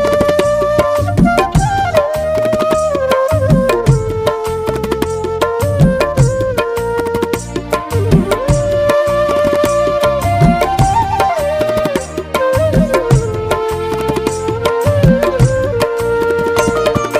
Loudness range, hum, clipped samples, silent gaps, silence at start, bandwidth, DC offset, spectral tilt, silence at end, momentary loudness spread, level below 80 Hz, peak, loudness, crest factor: 2 LU; none; under 0.1%; none; 0 s; 16 kHz; under 0.1%; -6.5 dB/octave; 0 s; 6 LU; -26 dBFS; 0 dBFS; -14 LUFS; 12 dB